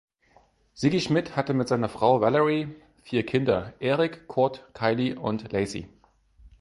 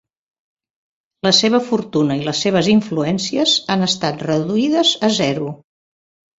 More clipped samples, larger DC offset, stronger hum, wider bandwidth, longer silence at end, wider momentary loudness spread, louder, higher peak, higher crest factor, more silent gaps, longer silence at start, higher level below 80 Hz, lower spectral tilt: neither; neither; neither; first, 11.5 kHz vs 7.8 kHz; second, 0.15 s vs 0.85 s; about the same, 8 LU vs 6 LU; second, -26 LUFS vs -16 LUFS; second, -8 dBFS vs 0 dBFS; about the same, 18 dB vs 18 dB; neither; second, 0.75 s vs 1.25 s; about the same, -56 dBFS vs -58 dBFS; first, -6.5 dB/octave vs -4.5 dB/octave